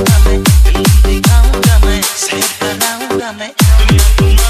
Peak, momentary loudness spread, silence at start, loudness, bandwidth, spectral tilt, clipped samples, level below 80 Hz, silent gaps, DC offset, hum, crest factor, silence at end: 0 dBFS; 6 LU; 0 s; -10 LUFS; 15.5 kHz; -4.5 dB/octave; 0.4%; -10 dBFS; none; under 0.1%; none; 8 dB; 0 s